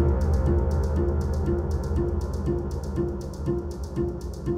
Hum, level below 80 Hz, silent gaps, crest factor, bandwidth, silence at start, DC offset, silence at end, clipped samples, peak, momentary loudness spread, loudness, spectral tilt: none; -28 dBFS; none; 14 dB; 9.8 kHz; 0 s; under 0.1%; 0 s; under 0.1%; -10 dBFS; 7 LU; -27 LUFS; -9 dB/octave